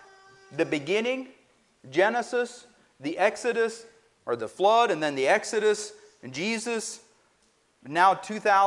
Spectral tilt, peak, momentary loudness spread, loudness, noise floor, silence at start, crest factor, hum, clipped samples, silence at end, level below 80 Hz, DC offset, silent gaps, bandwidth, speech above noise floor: -3.5 dB/octave; -8 dBFS; 17 LU; -26 LUFS; -66 dBFS; 0.5 s; 20 dB; none; under 0.1%; 0 s; -76 dBFS; under 0.1%; none; 11.5 kHz; 41 dB